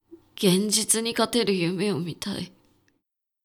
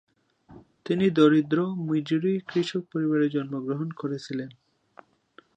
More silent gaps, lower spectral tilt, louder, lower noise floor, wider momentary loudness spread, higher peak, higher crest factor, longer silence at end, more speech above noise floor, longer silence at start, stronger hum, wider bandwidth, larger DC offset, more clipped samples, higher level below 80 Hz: neither; second, -3.5 dB/octave vs -7.5 dB/octave; about the same, -24 LUFS vs -26 LUFS; first, -78 dBFS vs -58 dBFS; about the same, 11 LU vs 13 LU; about the same, -6 dBFS vs -8 dBFS; about the same, 20 dB vs 20 dB; about the same, 0.95 s vs 1.05 s; first, 54 dB vs 33 dB; second, 0.1 s vs 0.5 s; neither; first, 19.5 kHz vs 8.6 kHz; neither; neither; first, -64 dBFS vs -70 dBFS